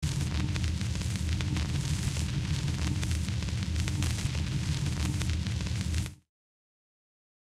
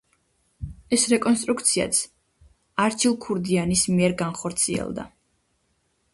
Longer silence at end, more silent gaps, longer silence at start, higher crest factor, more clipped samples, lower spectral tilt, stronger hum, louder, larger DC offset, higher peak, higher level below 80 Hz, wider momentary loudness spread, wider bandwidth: first, 1.3 s vs 1.05 s; neither; second, 0 s vs 0.6 s; about the same, 20 dB vs 20 dB; neither; first, -5 dB/octave vs -3.5 dB/octave; neither; second, -32 LUFS vs -22 LUFS; neither; second, -10 dBFS vs -6 dBFS; first, -38 dBFS vs -50 dBFS; second, 2 LU vs 16 LU; first, 14.5 kHz vs 12 kHz